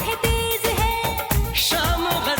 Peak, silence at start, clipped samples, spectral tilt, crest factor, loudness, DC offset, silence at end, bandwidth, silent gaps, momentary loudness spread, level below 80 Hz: -6 dBFS; 0 s; under 0.1%; -3.5 dB/octave; 16 dB; -21 LUFS; under 0.1%; 0 s; over 20 kHz; none; 3 LU; -28 dBFS